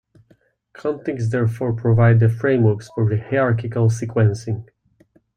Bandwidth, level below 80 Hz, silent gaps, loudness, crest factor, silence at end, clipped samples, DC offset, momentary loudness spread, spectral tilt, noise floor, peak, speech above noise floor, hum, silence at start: 9.2 kHz; -54 dBFS; none; -19 LUFS; 14 dB; 0.75 s; under 0.1%; under 0.1%; 12 LU; -8.5 dB/octave; -58 dBFS; -4 dBFS; 40 dB; none; 0.8 s